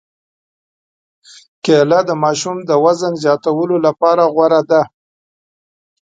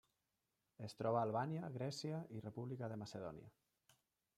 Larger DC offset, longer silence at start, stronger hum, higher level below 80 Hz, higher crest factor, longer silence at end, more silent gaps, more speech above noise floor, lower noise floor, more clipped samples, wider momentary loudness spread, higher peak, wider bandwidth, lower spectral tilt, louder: neither; first, 1.65 s vs 0.8 s; neither; first, -66 dBFS vs -82 dBFS; second, 16 dB vs 22 dB; first, 1.15 s vs 0.9 s; neither; first, over 77 dB vs 44 dB; about the same, under -90 dBFS vs -89 dBFS; neither; second, 5 LU vs 14 LU; first, 0 dBFS vs -26 dBFS; second, 9.2 kHz vs 14 kHz; about the same, -5.5 dB/octave vs -6.5 dB/octave; first, -14 LUFS vs -45 LUFS